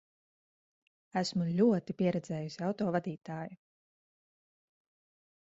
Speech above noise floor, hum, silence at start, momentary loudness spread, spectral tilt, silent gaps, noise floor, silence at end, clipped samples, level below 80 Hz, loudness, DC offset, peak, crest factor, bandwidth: over 58 dB; none; 1.15 s; 13 LU; -7 dB/octave; none; under -90 dBFS; 1.95 s; under 0.1%; -74 dBFS; -33 LUFS; under 0.1%; -16 dBFS; 20 dB; 7.8 kHz